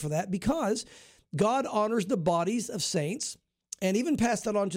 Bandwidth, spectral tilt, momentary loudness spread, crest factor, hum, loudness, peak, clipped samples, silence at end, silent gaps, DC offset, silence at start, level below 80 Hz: 16.5 kHz; -5 dB/octave; 9 LU; 14 dB; none; -29 LUFS; -16 dBFS; under 0.1%; 0 s; none; under 0.1%; 0 s; -56 dBFS